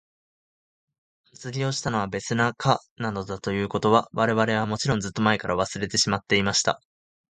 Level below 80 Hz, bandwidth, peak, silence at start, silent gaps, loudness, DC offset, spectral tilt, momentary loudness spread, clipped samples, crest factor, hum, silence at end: -54 dBFS; 9.6 kHz; -4 dBFS; 1.4 s; 2.91-2.96 s; -24 LUFS; under 0.1%; -4 dB/octave; 9 LU; under 0.1%; 22 dB; none; 0.6 s